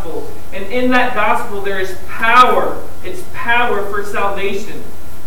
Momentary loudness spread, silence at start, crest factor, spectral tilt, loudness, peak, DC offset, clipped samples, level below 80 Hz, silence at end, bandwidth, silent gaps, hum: 19 LU; 0 s; 18 dB; -4.5 dB/octave; -15 LUFS; 0 dBFS; 20%; under 0.1%; -40 dBFS; 0 s; 19.5 kHz; none; none